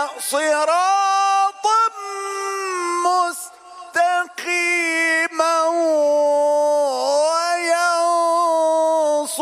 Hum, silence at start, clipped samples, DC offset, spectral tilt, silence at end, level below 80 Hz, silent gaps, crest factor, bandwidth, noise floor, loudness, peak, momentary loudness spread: none; 0 s; under 0.1%; under 0.1%; 0.5 dB/octave; 0 s; -78 dBFS; none; 14 dB; 15.5 kHz; -39 dBFS; -18 LUFS; -4 dBFS; 7 LU